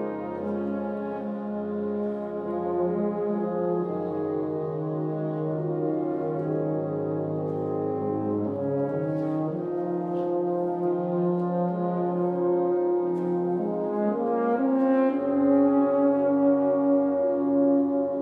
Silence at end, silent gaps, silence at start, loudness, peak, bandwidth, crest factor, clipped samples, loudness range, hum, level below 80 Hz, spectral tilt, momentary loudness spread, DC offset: 0 s; none; 0 s; -26 LUFS; -12 dBFS; 4.1 kHz; 14 dB; under 0.1%; 6 LU; none; -70 dBFS; -11.5 dB/octave; 8 LU; under 0.1%